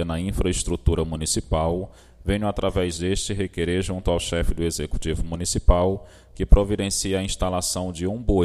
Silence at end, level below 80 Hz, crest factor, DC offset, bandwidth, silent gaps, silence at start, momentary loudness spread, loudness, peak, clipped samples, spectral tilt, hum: 0 s; -26 dBFS; 22 dB; under 0.1%; 14 kHz; none; 0 s; 7 LU; -24 LUFS; 0 dBFS; under 0.1%; -5 dB/octave; none